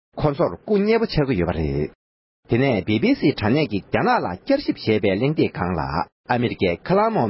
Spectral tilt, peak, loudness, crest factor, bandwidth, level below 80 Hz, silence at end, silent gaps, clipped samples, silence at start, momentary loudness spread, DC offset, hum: -11.5 dB/octave; -4 dBFS; -21 LUFS; 16 dB; 5.8 kHz; -40 dBFS; 0 s; 1.95-2.43 s, 6.12-6.24 s; under 0.1%; 0.15 s; 5 LU; under 0.1%; none